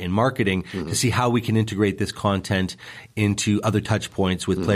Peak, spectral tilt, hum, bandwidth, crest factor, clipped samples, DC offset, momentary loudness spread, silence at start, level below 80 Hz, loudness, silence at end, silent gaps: -6 dBFS; -5.5 dB/octave; none; 15 kHz; 16 dB; under 0.1%; under 0.1%; 5 LU; 0 s; -48 dBFS; -23 LUFS; 0 s; none